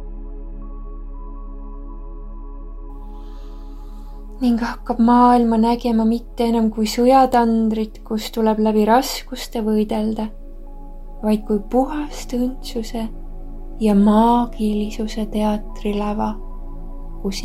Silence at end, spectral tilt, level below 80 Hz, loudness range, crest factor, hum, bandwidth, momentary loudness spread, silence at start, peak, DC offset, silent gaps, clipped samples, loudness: 0 s; -6 dB/octave; -32 dBFS; 18 LU; 18 dB; none; 15.5 kHz; 24 LU; 0 s; -2 dBFS; under 0.1%; none; under 0.1%; -19 LUFS